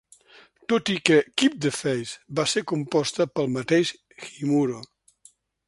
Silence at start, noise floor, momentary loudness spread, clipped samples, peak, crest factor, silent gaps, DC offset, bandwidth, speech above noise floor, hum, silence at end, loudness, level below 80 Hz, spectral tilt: 0.7 s; -58 dBFS; 11 LU; under 0.1%; -2 dBFS; 24 dB; none; under 0.1%; 11.5 kHz; 34 dB; none; 0.85 s; -24 LUFS; -66 dBFS; -4.5 dB/octave